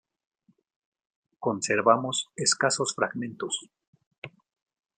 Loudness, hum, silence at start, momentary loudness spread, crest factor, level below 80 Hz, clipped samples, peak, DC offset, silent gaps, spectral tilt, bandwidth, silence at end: -26 LUFS; none; 1.4 s; 23 LU; 24 dB; -76 dBFS; under 0.1%; -6 dBFS; under 0.1%; 3.87-3.93 s, 4.06-4.11 s, 4.18-4.22 s; -2.5 dB/octave; 10.5 kHz; 0.7 s